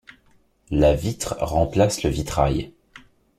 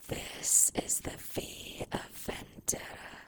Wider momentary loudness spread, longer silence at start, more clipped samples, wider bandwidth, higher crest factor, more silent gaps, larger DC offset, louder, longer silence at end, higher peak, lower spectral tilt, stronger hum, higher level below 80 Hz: second, 8 LU vs 17 LU; first, 0.7 s vs 0 s; neither; second, 16 kHz vs over 20 kHz; about the same, 20 dB vs 24 dB; neither; neither; first, -22 LUFS vs -31 LUFS; first, 0.7 s vs 0 s; first, -4 dBFS vs -10 dBFS; first, -6 dB/octave vs -1.5 dB/octave; neither; first, -34 dBFS vs -56 dBFS